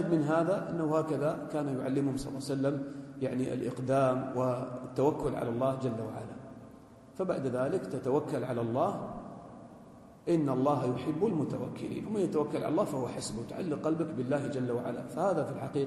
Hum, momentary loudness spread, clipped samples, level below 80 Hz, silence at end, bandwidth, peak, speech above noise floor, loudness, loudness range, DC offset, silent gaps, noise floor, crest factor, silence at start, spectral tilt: none; 13 LU; under 0.1%; -62 dBFS; 0 s; 12.5 kHz; -14 dBFS; 22 dB; -32 LUFS; 2 LU; under 0.1%; none; -53 dBFS; 18 dB; 0 s; -7.5 dB/octave